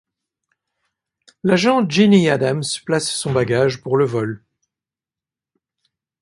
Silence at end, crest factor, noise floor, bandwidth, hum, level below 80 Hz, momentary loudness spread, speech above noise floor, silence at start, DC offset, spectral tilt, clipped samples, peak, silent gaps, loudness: 1.85 s; 18 dB; -89 dBFS; 11.5 kHz; none; -56 dBFS; 11 LU; 73 dB; 1.45 s; under 0.1%; -5.5 dB/octave; under 0.1%; -2 dBFS; none; -17 LUFS